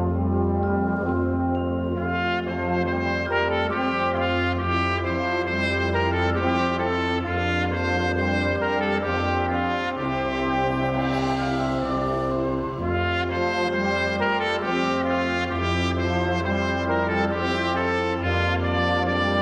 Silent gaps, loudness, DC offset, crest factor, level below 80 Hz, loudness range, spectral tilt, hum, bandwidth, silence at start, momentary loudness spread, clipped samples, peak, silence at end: none; -24 LUFS; under 0.1%; 14 dB; -42 dBFS; 1 LU; -6.5 dB/octave; none; 9 kHz; 0 s; 2 LU; under 0.1%; -8 dBFS; 0 s